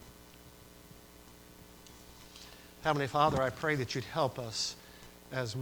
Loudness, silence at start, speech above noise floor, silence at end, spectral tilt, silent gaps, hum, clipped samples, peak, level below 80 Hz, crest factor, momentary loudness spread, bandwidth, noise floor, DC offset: -33 LUFS; 0 s; 23 dB; 0 s; -4.5 dB/octave; none; 60 Hz at -60 dBFS; under 0.1%; -14 dBFS; -60 dBFS; 22 dB; 25 LU; over 20 kHz; -55 dBFS; under 0.1%